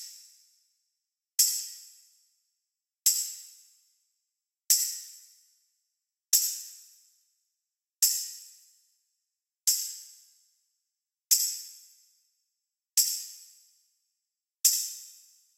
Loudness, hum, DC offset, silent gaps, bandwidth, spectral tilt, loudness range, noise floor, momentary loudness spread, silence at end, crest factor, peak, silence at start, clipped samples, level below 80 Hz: -26 LUFS; none; under 0.1%; none; 16 kHz; 11 dB/octave; 3 LU; -88 dBFS; 21 LU; 0.45 s; 28 dB; -6 dBFS; 0 s; under 0.1%; under -90 dBFS